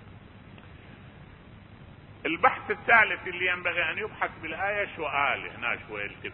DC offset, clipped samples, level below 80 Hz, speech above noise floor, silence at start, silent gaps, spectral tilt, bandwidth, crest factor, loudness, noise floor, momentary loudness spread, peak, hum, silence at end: under 0.1%; under 0.1%; -56 dBFS; 21 dB; 0 s; none; -8 dB/octave; 4.8 kHz; 24 dB; -27 LUFS; -49 dBFS; 12 LU; -6 dBFS; none; 0 s